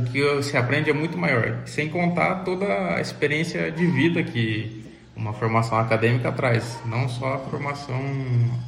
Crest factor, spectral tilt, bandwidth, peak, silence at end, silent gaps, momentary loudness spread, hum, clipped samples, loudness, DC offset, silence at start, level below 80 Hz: 16 dB; -6.5 dB/octave; 11.5 kHz; -6 dBFS; 0 s; none; 8 LU; none; under 0.1%; -23 LUFS; under 0.1%; 0 s; -54 dBFS